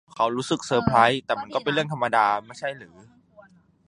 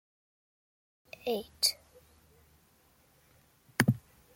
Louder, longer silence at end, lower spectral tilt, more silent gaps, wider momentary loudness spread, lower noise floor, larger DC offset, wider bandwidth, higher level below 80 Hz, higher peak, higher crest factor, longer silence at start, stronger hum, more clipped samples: first, -23 LUFS vs -32 LUFS; first, 1 s vs 0.35 s; first, -5 dB/octave vs -3.5 dB/octave; neither; about the same, 14 LU vs 16 LU; second, -54 dBFS vs -66 dBFS; neither; second, 11 kHz vs 16.5 kHz; first, -56 dBFS vs -68 dBFS; first, -2 dBFS vs -8 dBFS; second, 22 dB vs 30 dB; second, 0.15 s vs 1.25 s; neither; neither